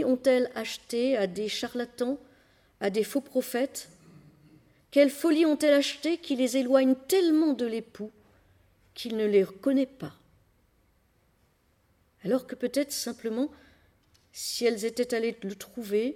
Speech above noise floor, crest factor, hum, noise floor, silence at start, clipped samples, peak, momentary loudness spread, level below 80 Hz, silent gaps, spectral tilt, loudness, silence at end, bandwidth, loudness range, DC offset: 41 dB; 20 dB; none; -68 dBFS; 0 s; under 0.1%; -10 dBFS; 15 LU; -70 dBFS; none; -4 dB/octave; -28 LUFS; 0 s; 19.5 kHz; 9 LU; under 0.1%